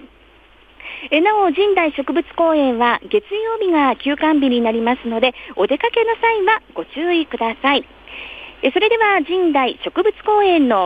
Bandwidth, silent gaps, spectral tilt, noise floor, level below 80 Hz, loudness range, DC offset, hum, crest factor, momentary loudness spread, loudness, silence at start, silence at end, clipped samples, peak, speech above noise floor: 5 kHz; none; -6 dB/octave; -48 dBFS; -52 dBFS; 1 LU; under 0.1%; none; 14 dB; 8 LU; -17 LUFS; 0 s; 0 s; under 0.1%; -2 dBFS; 32 dB